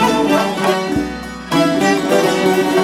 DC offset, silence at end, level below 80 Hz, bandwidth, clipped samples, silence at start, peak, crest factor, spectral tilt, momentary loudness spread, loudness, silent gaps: under 0.1%; 0 s; -42 dBFS; 16.5 kHz; under 0.1%; 0 s; -2 dBFS; 14 dB; -4.5 dB/octave; 7 LU; -15 LUFS; none